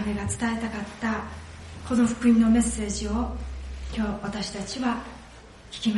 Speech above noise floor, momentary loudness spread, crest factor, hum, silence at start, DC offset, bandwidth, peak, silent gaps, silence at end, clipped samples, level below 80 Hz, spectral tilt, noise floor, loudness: 21 dB; 20 LU; 16 dB; none; 0 s; under 0.1%; 11.5 kHz; -10 dBFS; none; 0 s; under 0.1%; -40 dBFS; -5 dB/octave; -47 dBFS; -26 LUFS